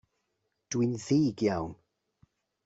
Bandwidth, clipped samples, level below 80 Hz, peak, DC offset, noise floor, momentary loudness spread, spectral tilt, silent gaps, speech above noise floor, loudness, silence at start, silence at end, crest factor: 8 kHz; under 0.1%; -64 dBFS; -16 dBFS; under 0.1%; -80 dBFS; 9 LU; -6.5 dB/octave; none; 52 dB; -29 LUFS; 0.7 s; 0.9 s; 16 dB